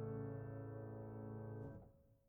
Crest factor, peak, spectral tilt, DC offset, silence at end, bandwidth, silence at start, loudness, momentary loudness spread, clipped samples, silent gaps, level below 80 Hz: 14 dB; -36 dBFS; -8 dB/octave; under 0.1%; 0.1 s; 2.8 kHz; 0 s; -51 LUFS; 8 LU; under 0.1%; none; -70 dBFS